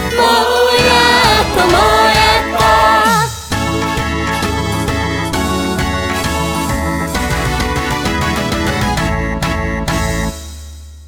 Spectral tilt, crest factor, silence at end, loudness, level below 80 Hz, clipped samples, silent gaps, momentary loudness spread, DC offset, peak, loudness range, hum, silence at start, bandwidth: -4 dB/octave; 14 dB; 0 s; -13 LUFS; -24 dBFS; under 0.1%; none; 8 LU; under 0.1%; 0 dBFS; 7 LU; none; 0 s; 18 kHz